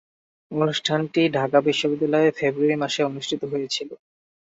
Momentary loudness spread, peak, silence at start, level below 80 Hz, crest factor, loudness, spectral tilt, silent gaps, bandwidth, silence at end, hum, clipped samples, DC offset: 8 LU; -4 dBFS; 0.5 s; -68 dBFS; 18 dB; -22 LUFS; -5 dB/octave; none; 8 kHz; 0.65 s; none; under 0.1%; under 0.1%